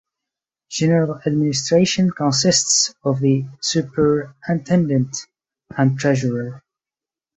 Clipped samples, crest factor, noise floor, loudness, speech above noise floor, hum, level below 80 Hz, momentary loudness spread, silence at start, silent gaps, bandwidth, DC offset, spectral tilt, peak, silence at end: under 0.1%; 16 dB; under -90 dBFS; -18 LUFS; over 72 dB; none; -56 dBFS; 9 LU; 0.7 s; none; 8.4 kHz; under 0.1%; -4.5 dB/octave; -4 dBFS; 0.8 s